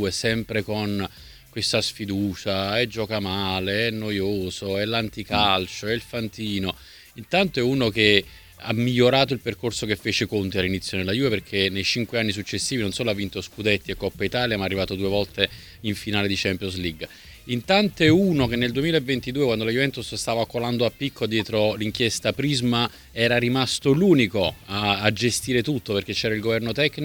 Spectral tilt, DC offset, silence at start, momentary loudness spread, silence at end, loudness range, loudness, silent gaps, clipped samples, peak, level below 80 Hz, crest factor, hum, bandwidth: -4.5 dB/octave; under 0.1%; 0 s; 9 LU; 0 s; 4 LU; -23 LUFS; none; under 0.1%; 0 dBFS; -48 dBFS; 24 dB; none; over 20 kHz